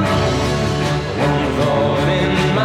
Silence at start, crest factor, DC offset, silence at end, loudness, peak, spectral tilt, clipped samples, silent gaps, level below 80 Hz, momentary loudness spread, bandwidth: 0 s; 10 dB; under 0.1%; 0 s; -17 LUFS; -6 dBFS; -6 dB/octave; under 0.1%; none; -32 dBFS; 2 LU; 14 kHz